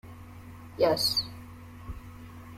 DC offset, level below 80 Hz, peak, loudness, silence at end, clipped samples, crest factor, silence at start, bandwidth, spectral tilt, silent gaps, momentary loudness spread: under 0.1%; -52 dBFS; -12 dBFS; -27 LUFS; 0 s; under 0.1%; 20 dB; 0.05 s; 16.5 kHz; -3.5 dB/octave; none; 22 LU